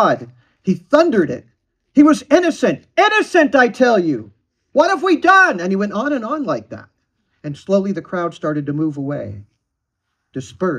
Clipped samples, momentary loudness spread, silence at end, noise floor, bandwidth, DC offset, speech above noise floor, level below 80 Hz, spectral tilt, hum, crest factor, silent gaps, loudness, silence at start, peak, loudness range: under 0.1%; 18 LU; 0 s; -75 dBFS; 10 kHz; under 0.1%; 60 dB; -60 dBFS; -5.5 dB/octave; none; 16 dB; none; -16 LUFS; 0 s; 0 dBFS; 9 LU